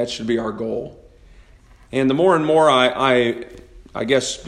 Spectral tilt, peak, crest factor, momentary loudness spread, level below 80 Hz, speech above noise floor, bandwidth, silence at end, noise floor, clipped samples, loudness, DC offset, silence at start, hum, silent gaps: -4.5 dB/octave; -2 dBFS; 18 dB; 16 LU; -48 dBFS; 30 dB; 12 kHz; 0 s; -48 dBFS; under 0.1%; -18 LUFS; under 0.1%; 0 s; none; none